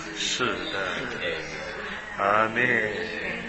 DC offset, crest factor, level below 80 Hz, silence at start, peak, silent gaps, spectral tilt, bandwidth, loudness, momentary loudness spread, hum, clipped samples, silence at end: under 0.1%; 20 dB; -54 dBFS; 0 s; -8 dBFS; none; -3 dB/octave; 8.6 kHz; -26 LUFS; 11 LU; none; under 0.1%; 0 s